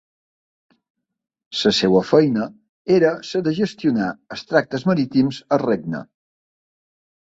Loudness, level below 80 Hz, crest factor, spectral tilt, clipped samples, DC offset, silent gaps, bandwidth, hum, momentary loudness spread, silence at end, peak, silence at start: -19 LUFS; -60 dBFS; 20 dB; -6 dB/octave; under 0.1%; under 0.1%; 2.69-2.85 s; 8 kHz; none; 13 LU; 1.35 s; -2 dBFS; 1.5 s